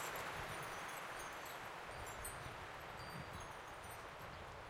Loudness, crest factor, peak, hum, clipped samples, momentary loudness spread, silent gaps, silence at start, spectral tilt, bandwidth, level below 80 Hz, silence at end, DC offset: -49 LUFS; 18 dB; -32 dBFS; none; under 0.1%; 6 LU; none; 0 s; -3 dB/octave; 16.5 kHz; -64 dBFS; 0 s; under 0.1%